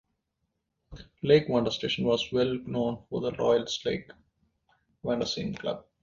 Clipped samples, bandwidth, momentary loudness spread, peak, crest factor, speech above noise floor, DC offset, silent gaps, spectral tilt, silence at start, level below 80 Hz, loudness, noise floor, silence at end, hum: under 0.1%; 7.6 kHz; 11 LU; -8 dBFS; 22 dB; 52 dB; under 0.1%; none; -5.5 dB/octave; 0.9 s; -58 dBFS; -28 LUFS; -80 dBFS; 0.2 s; none